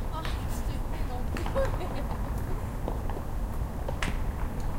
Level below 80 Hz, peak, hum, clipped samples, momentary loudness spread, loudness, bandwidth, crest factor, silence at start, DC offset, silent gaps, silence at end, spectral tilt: -32 dBFS; -12 dBFS; none; under 0.1%; 5 LU; -34 LUFS; 16.5 kHz; 18 dB; 0 s; under 0.1%; none; 0 s; -6 dB/octave